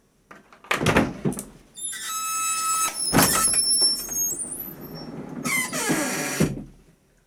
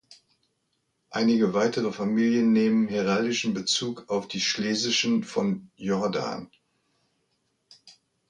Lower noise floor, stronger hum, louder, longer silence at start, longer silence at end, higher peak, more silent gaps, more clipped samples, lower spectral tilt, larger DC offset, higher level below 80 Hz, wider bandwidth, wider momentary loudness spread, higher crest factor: second, -57 dBFS vs -75 dBFS; neither; first, -22 LUFS vs -25 LUFS; first, 0.3 s vs 0.1 s; first, 0.55 s vs 0.4 s; first, -4 dBFS vs -10 dBFS; neither; neither; second, -2.5 dB/octave vs -4 dB/octave; neither; first, -48 dBFS vs -68 dBFS; first, over 20 kHz vs 9.8 kHz; first, 18 LU vs 9 LU; first, 22 dB vs 16 dB